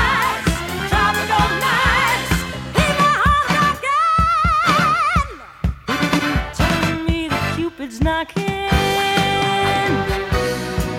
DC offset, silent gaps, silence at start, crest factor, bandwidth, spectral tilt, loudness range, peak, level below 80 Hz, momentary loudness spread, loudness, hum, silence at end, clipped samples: under 0.1%; none; 0 s; 16 dB; 17 kHz; -4.5 dB/octave; 4 LU; -2 dBFS; -28 dBFS; 7 LU; -17 LUFS; none; 0 s; under 0.1%